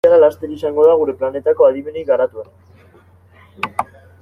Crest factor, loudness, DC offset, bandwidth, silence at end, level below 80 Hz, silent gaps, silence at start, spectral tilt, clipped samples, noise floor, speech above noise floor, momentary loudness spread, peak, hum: 14 dB; -16 LUFS; under 0.1%; 10.5 kHz; 0.4 s; -60 dBFS; none; 0.05 s; -6.5 dB/octave; under 0.1%; -47 dBFS; 33 dB; 14 LU; -2 dBFS; none